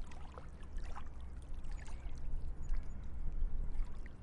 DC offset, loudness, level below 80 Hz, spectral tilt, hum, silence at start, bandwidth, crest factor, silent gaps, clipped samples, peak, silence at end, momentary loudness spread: under 0.1%; -49 LUFS; -40 dBFS; -6.5 dB/octave; none; 0 s; 7.4 kHz; 12 dB; none; under 0.1%; -24 dBFS; 0 s; 7 LU